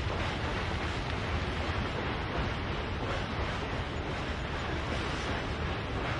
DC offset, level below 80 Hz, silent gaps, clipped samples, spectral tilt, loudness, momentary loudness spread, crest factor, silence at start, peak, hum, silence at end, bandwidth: under 0.1%; -40 dBFS; none; under 0.1%; -5.5 dB/octave; -34 LUFS; 2 LU; 14 dB; 0 s; -20 dBFS; none; 0 s; 11 kHz